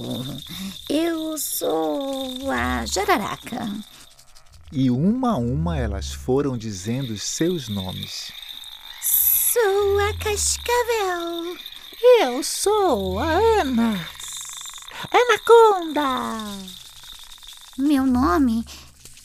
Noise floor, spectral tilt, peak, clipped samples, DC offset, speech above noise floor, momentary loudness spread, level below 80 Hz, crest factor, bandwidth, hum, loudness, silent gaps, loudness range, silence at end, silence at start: -47 dBFS; -4 dB/octave; -2 dBFS; under 0.1%; under 0.1%; 26 dB; 18 LU; -42 dBFS; 20 dB; 16 kHz; none; -21 LUFS; none; 6 LU; 0.1 s; 0 s